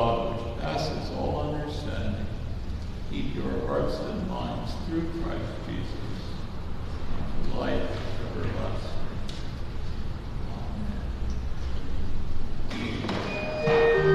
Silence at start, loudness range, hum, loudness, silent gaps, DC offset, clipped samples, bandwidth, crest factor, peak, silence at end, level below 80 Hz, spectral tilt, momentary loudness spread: 0 s; 4 LU; none; -32 LUFS; none; under 0.1%; under 0.1%; 7.8 kHz; 18 dB; -10 dBFS; 0 s; -34 dBFS; -7 dB/octave; 8 LU